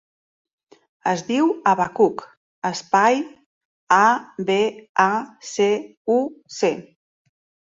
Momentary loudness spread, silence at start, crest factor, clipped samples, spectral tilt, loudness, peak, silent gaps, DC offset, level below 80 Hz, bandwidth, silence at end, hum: 11 LU; 1.05 s; 20 dB; under 0.1%; -4.5 dB/octave; -20 LUFS; -2 dBFS; 2.37-2.62 s, 3.46-3.87 s, 4.89-4.95 s, 5.97-6.05 s; under 0.1%; -68 dBFS; 7.8 kHz; 0.8 s; none